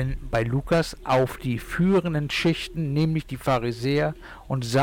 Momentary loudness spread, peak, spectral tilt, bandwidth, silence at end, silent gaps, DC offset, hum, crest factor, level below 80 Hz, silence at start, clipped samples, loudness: 7 LU; -14 dBFS; -6.5 dB/octave; 17 kHz; 0 s; none; under 0.1%; none; 10 dB; -40 dBFS; 0 s; under 0.1%; -25 LUFS